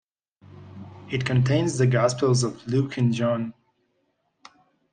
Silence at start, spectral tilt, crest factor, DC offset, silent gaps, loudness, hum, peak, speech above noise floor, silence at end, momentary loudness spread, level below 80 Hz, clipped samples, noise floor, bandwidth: 0.55 s; -6 dB/octave; 18 dB; under 0.1%; none; -23 LUFS; none; -8 dBFS; 50 dB; 1.4 s; 22 LU; -60 dBFS; under 0.1%; -72 dBFS; 9.6 kHz